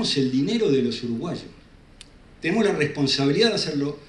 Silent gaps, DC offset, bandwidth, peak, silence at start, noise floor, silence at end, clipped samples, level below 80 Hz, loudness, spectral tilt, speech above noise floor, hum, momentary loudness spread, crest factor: none; under 0.1%; 11 kHz; -6 dBFS; 0 s; -48 dBFS; 0.05 s; under 0.1%; -54 dBFS; -22 LUFS; -5 dB/octave; 26 dB; none; 10 LU; 18 dB